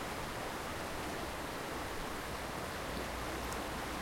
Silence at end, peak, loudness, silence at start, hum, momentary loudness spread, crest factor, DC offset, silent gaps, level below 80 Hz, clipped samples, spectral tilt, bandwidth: 0 s; -24 dBFS; -40 LUFS; 0 s; none; 1 LU; 16 dB; under 0.1%; none; -52 dBFS; under 0.1%; -3.5 dB/octave; 16.5 kHz